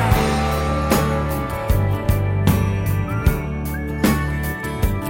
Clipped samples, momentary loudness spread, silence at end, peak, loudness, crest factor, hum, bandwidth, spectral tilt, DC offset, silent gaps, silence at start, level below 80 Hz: under 0.1%; 6 LU; 0 s; -4 dBFS; -20 LUFS; 16 dB; none; 17 kHz; -6.5 dB/octave; under 0.1%; none; 0 s; -26 dBFS